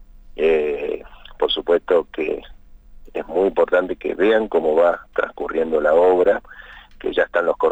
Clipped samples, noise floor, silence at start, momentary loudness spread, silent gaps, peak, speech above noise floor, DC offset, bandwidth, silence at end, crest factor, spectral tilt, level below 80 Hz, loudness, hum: under 0.1%; -42 dBFS; 0 s; 13 LU; none; -6 dBFS; 24 dB; under 0.1%; 8 kHz; 0 s; 14 dB; -6 dB/octave; -46 dBFS; -19 LUFS; none